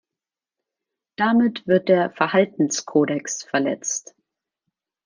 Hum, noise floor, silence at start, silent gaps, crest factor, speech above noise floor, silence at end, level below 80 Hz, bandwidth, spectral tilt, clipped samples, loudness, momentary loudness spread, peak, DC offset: none; -89 dBFS; 1.2 s; none; 20 dB; 69 dB; 1.05 s; -70 dBFS; 10 kHz; -4.5 dB/octave; under 0.1%; -21 LUFS; 8 LU; -4 dBFS; under 0.1%